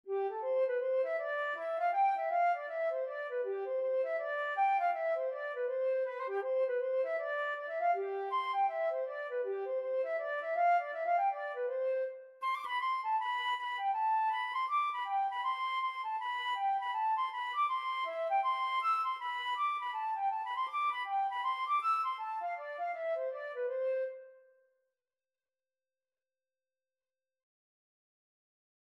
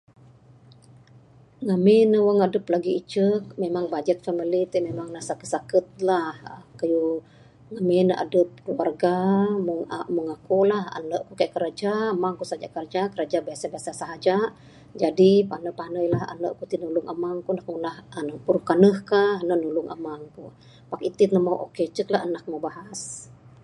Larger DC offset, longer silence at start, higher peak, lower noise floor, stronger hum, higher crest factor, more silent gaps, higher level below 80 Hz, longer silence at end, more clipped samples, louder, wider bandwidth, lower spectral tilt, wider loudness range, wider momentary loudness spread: neither; second, 0.05 s vs 1.6 s; second, -22 dBFS vs -2 dBFS; first, under -90 dBFS vs -52 dBFS; neither; second, 12 dB vs 22 dB; neither; second, under -90 dBFS vs -64 dBFS; first, 4.5 s vs 0.3 s; neither; second, -34 LUFS vs -24 LUFS; about the same, 11.5 kHz vs 11.5 kHz; second, 0 dB/octave vs -6.5 dB/octave; about the same, 3 LU vs 5 LU; second, 6 LU vs 15 LU